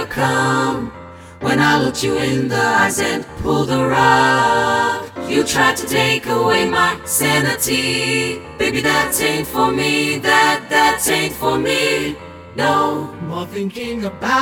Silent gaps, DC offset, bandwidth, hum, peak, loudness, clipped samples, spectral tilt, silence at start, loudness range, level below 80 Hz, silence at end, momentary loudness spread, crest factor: none; under 0.1%; 19 kHz; none; 0 dBFS; -16 LUFS; under 0.1%; -3.5 dB/octave; 0 s; 2 LU; -44 dBFS; 0 s; 11 LU; 16 dB